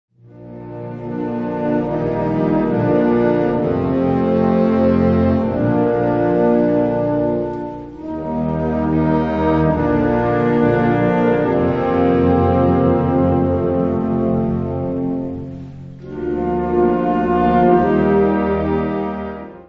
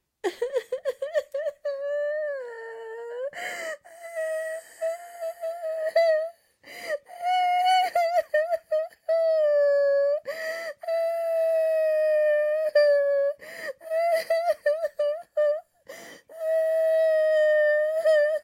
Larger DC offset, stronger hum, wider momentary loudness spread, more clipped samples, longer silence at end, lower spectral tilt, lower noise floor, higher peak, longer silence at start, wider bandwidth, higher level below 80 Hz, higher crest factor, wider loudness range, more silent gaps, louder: first, 0.1% vs under 0.1%; neither; second, 12 LU vs 15 LU; neither; about the same, 0.05 s vs 0 s; first, -10.5 dB/octave vs -1 dB/octave; second, -37 dBFS vs -47 dBFS; first, 0 dBFS vs -12 dBFS; about the same, 0.35 s vs 0.25 s; second, 5.8 kHz vs 16 kHz; first, -38 dBFS vs -82 dBFS; about the same, 16 dB vs 14 dB; second, 4 LU vs 8 LU; neither; first, -17 LUFS vs -25 LUFS